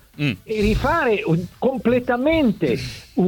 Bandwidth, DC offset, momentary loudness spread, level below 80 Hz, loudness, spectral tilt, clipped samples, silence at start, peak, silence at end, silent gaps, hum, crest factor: 19 kHz; under 0.1%; 6 LU; -36 dBFS; -20 LUFS; -7 dB/octave; under 0.1%; 0.2 s; -6 dBFS; 0 s; none; none; 14 dB